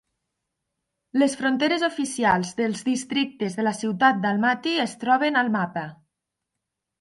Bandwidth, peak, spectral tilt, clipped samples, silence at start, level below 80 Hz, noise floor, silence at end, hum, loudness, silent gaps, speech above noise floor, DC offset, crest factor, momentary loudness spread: 11.5 kHz; -6 dBFS; -4.5 dB/octave; under 0.1%; 1.15 s; -66 dBFS; -83 dBFS; 1.05 s; none; -23 LUFS; none; 60 dB; under 0.1%; 18 dB; 6 LU